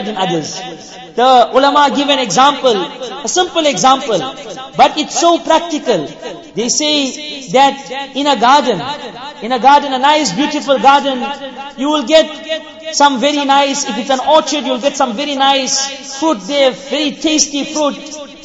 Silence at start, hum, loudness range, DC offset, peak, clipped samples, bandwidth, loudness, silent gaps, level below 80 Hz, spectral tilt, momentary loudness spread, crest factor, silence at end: 0 s; none; 2 LU; under 0.1%; 0 dBFS; under 0.1%; 8 kHz; -12 LUFS; none; -52 dBFS; -2.5 dB/octave; 14 LU; 14 dB; 0 s